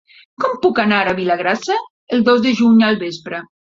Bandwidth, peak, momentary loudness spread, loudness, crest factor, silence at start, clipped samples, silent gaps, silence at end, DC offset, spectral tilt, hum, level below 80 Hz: 7.4 kHz; 0 dBFS; 10 LU; -16 LUFS; 16 dB; 0.4 s; under 0.1%; 1.90-2.07 s; 0.25 s; under 0.1%; -5.5 dB/octave; none; -58 dBFS